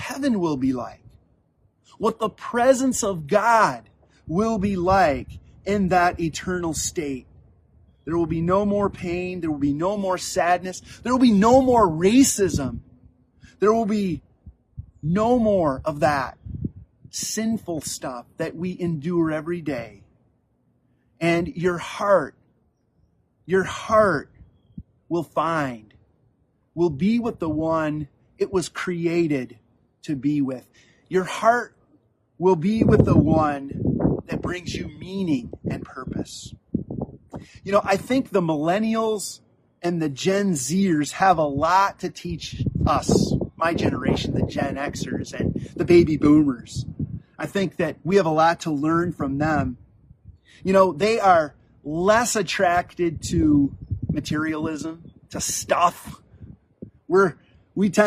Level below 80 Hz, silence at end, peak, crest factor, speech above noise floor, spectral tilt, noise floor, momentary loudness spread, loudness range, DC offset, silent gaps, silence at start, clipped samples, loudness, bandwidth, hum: -46 dBFS; 0 s; 0 dBFS; 22 dB; 44 dB; -5.5 dB/octave; -65 dBFS; 15 LU; 6 LU; under 0.1%; none; 0 s; under 0.1%; -22 LUFS; 15 kHz; none